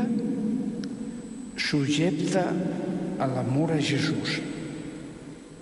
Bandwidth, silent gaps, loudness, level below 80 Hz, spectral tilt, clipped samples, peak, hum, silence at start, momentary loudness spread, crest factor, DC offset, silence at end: 11.5 kHz; none; -28 LUFS; -58 dBFS; -5.5 dB/octave; under 0.1%; -12 dBFS; none; 0 s; 13 LU; 16 dB; under 0.1%; 0 s